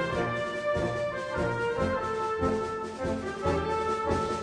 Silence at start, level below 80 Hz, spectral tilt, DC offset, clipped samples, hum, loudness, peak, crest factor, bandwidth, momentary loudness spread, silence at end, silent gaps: 0 s; -46 dBFS; -6 dB/octave; under 0.1%; under 0.1%; none; -30 LUFS; -16 dBFS; 14 dB; 10.5 kHz; 4 LU; 0 s; none